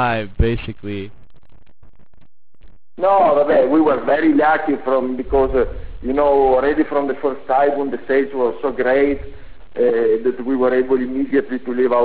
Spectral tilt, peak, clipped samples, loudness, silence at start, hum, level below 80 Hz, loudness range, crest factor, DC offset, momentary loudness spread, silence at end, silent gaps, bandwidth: -10.5 dB/octave; -4 dBFS; under 0.1%; -17 LUFS; 0 s; none; -34 dBFS; 3 LU; 12 dB; 2%; 10 LU; 0 s; none; 4 kHz